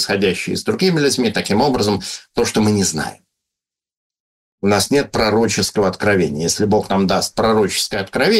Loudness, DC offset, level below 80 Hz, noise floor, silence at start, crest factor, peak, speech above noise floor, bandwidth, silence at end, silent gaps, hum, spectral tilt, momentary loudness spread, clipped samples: -17 LUFS; under 0.1%; -44 dBFS; -86 dBFS; 0 s; 14 dB; -2 dBFS; 69 dB; 16 kHz; 0 s; 3.97-4.10 s, 4.20-4.58 s; none; -4 dB/octave; 5 LU; under 0.1%